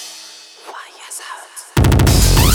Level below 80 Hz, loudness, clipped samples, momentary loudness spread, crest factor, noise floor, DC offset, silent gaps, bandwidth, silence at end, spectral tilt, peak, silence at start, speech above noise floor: -20 dBFS; -13 LUFS; under 0.1%; 22 LU; 14 dB; -38 dBFS; under 0.1%; none; over 20 kHz; 0 s; -4.5 dB/octave; 0 dBFS; 0 s; 24 dB